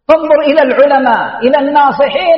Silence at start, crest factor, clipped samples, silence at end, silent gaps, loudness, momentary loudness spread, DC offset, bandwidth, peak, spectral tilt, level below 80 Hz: 0.1 s; 8 dB; 0.3%; 0 s; none; -9 LUFS; 4 LU; under 0.1%; 5.8 kHz; 0 dBFS; -6.5 dB/octave; -48 dBFS